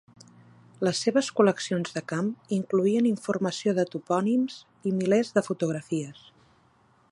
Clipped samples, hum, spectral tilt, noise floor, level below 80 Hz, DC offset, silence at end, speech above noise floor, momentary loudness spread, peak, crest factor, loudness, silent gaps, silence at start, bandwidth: under 0.1%; none; -5.5 dB/octave; -62 dBFS; -74 dBFS; under 0.1%; 1 s; 36 dB; 8 LU; -8 dBFS; 20 dB; -27 LUFS; none; 0.8 s; 11.5 kHz